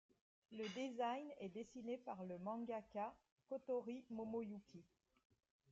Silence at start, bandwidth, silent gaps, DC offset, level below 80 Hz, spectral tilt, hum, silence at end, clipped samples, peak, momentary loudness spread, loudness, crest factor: 0.5 s; 8 kHz; 3.32-3.37 s; under 0.1%; -86 dBFS; -4.5 dB/octave; none; 0.85 s; under 0.1%; -34 dBFS; 8 LU; -49 LUFS; 16 dB